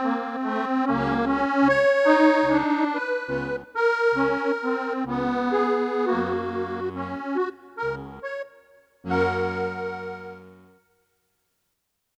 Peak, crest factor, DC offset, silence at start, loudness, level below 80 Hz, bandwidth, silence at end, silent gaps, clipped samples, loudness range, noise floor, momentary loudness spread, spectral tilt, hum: -6 dBFS; 20 dB; under 0.1%; 0 s; -24 LUFS; -54 dBFS; 8.8 kHz; 1.65 s; none; under 0.1%; 9 LU; -76 dBFS; 15 LU; -6.5 dB/octave; none